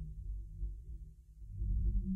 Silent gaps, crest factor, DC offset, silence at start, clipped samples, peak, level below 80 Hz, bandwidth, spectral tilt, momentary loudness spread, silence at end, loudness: none; 14 dB; under 0.1%; 0 s; under 0.1%; -24 dBFS; -40 dBFS; 0.4 kHz; -11.5 dB/octave; 17 LU; 0 s; -43 LUFS